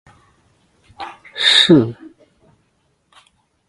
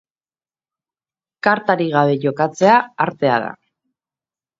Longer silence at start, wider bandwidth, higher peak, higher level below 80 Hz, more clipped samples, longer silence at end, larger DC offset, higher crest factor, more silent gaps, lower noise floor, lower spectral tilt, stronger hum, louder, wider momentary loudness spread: second, 1 s vs 1.45 s; first, 11.5 kHz vs 7.8 kHz; about the same, 0 dBFS vs 0 dBFS; first, -58 dBFS vs -66 dBFS; neither; first, 1.75 s vs 1.05 s; neither; about the same, 20 dB vs 20 dB; neither; second, -64 dBFS vs under -90 dBFS; second, -4 dB/octave vs -6 dB/octave; neither; first, -12 LUFS vs -17 LUFS; first, 24 LU vs 7 LU